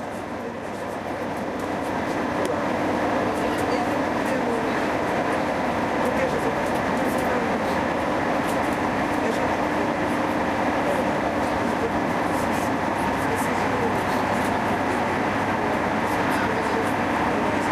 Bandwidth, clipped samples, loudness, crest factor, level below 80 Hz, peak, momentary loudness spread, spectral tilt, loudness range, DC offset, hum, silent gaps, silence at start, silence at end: 15.5 kHz; under 0.1%; -24 LUFS; 14 dB; -46 dBFS; -10 dBFS; 3 LU; -5.5 dB/octave; 1 LU; under 0.1%; none; none; 0 s; 0 s